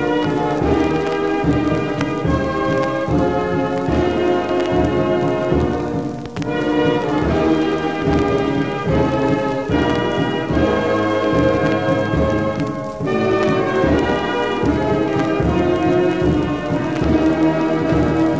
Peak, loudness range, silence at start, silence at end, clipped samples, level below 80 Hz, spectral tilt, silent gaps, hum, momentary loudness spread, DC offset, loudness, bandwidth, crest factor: -4 dBFS; 1 LU; 0 s; 0 s; under 0.1%; -32 dBFS; -7.5 dB/octave; none; none; 4 LU; 0.6%; -18 LUFS; 8 kHz; 14 dB